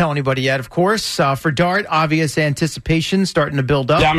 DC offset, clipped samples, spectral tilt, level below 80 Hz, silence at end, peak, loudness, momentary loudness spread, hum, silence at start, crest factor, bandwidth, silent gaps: under 0.1%; under 0.1%; -5.5 dB/octave; -38 dBFS; 0 s; -6 dBFS; -17 LUFS; 3 LU; none; 0 s; 12 dB; 13.5 kHz; none